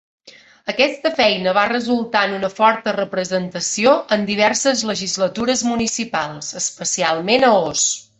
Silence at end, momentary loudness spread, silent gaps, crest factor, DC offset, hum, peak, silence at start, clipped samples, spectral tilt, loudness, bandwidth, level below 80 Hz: 0.2 s; 7 LU; none; 18 dB; under 0.1%; none; -2 dBFS; 0.25 s; under 0.1%; -2.5 dB/octave; -18 LUFS; 8.4 kHz; -56 dBFS